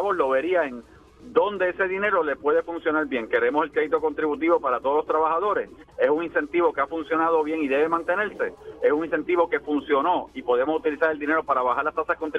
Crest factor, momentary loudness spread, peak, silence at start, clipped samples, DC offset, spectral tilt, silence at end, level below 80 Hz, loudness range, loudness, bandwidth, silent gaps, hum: 16 dB; 4 LU; -6 dBFS; 0 s; under 0.1%; under 0.1%; -6.5 dB/octave; 0 s; -58 dBFS; 1 LU; -24 LUFS; 6 kHz; none; none